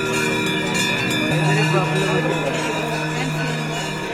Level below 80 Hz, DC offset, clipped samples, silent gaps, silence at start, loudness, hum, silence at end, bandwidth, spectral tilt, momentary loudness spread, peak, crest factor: -50 dBFS; under 0.1%; under 0.1%; none; 0 s; -20 LUFS; none; 0 s; 16 kHz; -4.5 dB/octave; 5 LU; -6 dBFS; 14 dB